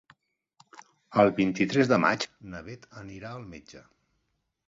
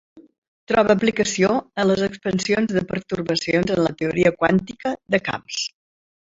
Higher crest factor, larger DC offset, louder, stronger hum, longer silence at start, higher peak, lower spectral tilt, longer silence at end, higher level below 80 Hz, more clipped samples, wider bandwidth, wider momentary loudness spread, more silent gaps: about the same, 22 dB vs 20 dB; neither; second, -25 LUFS vs -21 LUFS; neither; first, 1.1 s vs 0.15 s; second, -6 dBFS vs -2 dBFS; about the same, -6 dB/octave vs -5 dB/octave; first, 0.9 s vs 0.7 s; second, -62 dBFS vs -52 dBFS; neither; about the same, 7.8 kHz vs 8 kHz; first, 22 LU vs 9 LU; second, none vs 0.38-0.42 s, 0.48-0.67 s